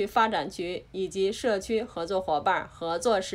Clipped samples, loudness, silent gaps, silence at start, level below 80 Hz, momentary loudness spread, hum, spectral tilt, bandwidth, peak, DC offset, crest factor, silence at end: under 0.1%; -28 LUFS; none; 0 s; -56 dBFS; 8 LU; none; -4 dB/octave; 16 kHz; -10 dBFS; under 0.1%; 18 dB; 0 s